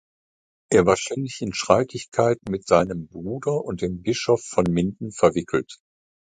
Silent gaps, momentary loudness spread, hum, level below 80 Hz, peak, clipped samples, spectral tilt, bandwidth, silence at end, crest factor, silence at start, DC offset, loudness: 2.08-2.12 s; 8 LU; none; -50 dBFS; 0 dBFS; under 0.1%; -5.5 dB/octave; 9.6 kHz; 0.55 s; 22 dB; 0.7 s; under 0.1%; -23 LUFS